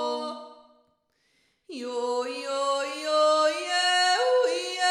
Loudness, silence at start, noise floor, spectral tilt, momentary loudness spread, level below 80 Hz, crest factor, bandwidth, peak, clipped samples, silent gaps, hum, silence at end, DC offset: -25 LUFS; 0 s; -70 dBFS; 1 dB/octave; 14 LU; -86 dBFS; 14 dB; 14 kHz; -12 dBFS; under 0.1%; none; none; 0 s; under 0.1%